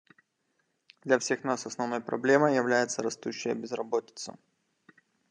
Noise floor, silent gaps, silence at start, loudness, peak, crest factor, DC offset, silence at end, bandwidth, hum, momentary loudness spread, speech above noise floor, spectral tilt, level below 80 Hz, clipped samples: -77 dBFS; none; 1.05 s; -29 LUFS; -8 dBFS; 22 dB; under 0.1%; 0.95 s; 10.5 kHz; none; 14 LU; 48 dB; -4 dB/octave; -82 dBFS; under 0.1%